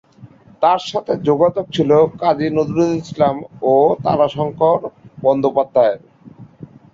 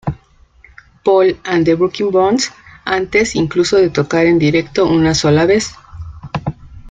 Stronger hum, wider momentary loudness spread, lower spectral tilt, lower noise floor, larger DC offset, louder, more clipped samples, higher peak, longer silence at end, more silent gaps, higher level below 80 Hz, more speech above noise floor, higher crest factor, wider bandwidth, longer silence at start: neither; second, 6 LU vs 14 LU; first, -7 dB/octave vs -5.5 dB/octave; second, -43 dBFS vs -47 dBFS; neither; about the same, -16 LUFS vs -14 LUFS; neither; about the same, -2 dBFS vs -2 dBFS; first, 0.3 s vs 0 s; neither; second, -54 dBFS vs -40 dBFS; second, 28 dB vs 34 dB; about the same, 16 dB vs 14 dB; second, 7.6 kHz vs 9.4 kHz; first, 0.2 s vs 0.05 s